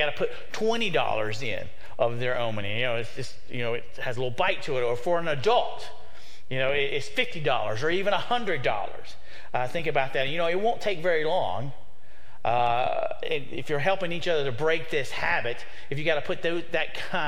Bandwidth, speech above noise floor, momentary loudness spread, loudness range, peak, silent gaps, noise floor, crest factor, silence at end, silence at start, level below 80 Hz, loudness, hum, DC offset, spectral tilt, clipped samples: 15.5 kHz; 27 dB; 9 LU; 2 LU; -8 dBFS; none; -54 dBFS; 20 dB; 0 s; 0 s; -56 dBFS; -28 LUFS; none; 5%; -5 dB/octave; under 0.1%